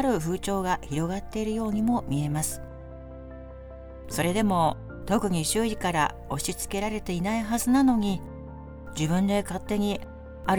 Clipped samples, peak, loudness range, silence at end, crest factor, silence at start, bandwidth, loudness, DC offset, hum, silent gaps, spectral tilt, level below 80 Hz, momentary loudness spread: under 0.1%; -10 dBFS; 4 LU; 0 s; 18 dB; 0 s; over 20 kHz; -27 LUFS; under 0.1%; none; none; -5 dB/octave; -44 dBFS; 19 LU